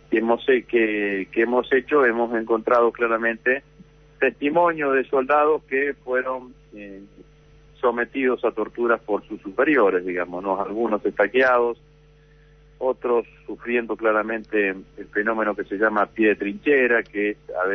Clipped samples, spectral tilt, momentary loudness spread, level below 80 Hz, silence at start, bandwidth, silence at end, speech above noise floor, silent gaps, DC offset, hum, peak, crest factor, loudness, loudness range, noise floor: under 0.1%; -7 dB/octave; 8 LU; -56 dBFS; 0.1 s; 6.2 kHz; 0 s; 31 dB; none; under 0.1%; none; -6 dBFS; 16 dB; -22 LUFS; 5 LU; -52 dBFS